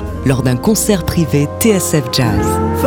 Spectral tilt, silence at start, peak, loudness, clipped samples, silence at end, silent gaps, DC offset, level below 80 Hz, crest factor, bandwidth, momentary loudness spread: -5 dB/octave; 0 s; 0 dBFS; -14 LUFS; under 0.1%; 0 s; none; under 0.1%; -30 dBFS; 12 dB; 19.5 kHz; 3 LU